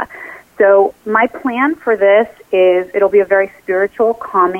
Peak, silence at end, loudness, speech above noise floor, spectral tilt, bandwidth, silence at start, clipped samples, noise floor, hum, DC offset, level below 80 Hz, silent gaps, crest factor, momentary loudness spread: -2 dBFS; 0 s; -13 LUFS; 21 dB; -6.5 dB/octave; 3.5 kHz; 0 s; under 0.1%; -33 dBFS; none; under 0.1%; -56 dBFS; none; 12 dB; 6 LU